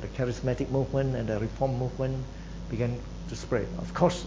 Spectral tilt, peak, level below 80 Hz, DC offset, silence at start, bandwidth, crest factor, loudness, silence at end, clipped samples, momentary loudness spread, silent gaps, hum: -7 dB/octave; -8 dBFS; -42 dBFS; under 0.1%; 0 s; 8 kHz; 22 dB; -31 LUFS; 0 s; under 0.1%; 10 LU; none; none